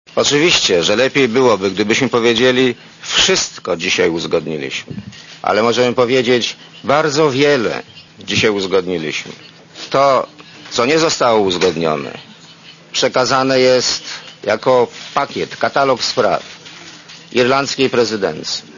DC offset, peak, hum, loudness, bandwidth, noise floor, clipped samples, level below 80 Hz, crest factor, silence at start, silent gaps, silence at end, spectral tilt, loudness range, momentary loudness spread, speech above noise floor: under 0.1%; 0 dBFS; none; -15 LUFS; 7.4 kHz; -40 dBFS; under 0.1%; -52 dBFS; 14 dB; 0.15 s; none; 0 s; -3.5 dB/octave; 3 LU; 14 LU; 25 dB